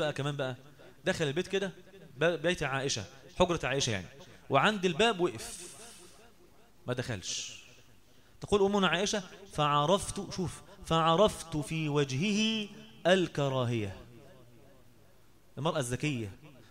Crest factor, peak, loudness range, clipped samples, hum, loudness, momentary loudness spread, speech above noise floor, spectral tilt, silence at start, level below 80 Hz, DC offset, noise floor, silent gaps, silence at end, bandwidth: 22 dB; -10 dBFS; 6 LU; under 0.1%; none; -31 LUFS; 16 LU; 32 dB; -4.5 dB/octave; 0 s; -56 dBFS; 0.1%; -63 dBFS; none; 0.2 s; 16 kHz